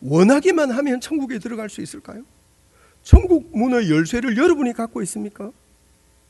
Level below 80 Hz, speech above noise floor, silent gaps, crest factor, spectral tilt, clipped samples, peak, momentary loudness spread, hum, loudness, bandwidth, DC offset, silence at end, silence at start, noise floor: -26 dBFS; 38 dB; none; 20 dB; -6.5 dB/octave; 0.2%; 0 dBFS; 19 LU; none; -19 LUFS; 12 kHz; under 0.1%; 0.8 s; 0 s; -56 dBFS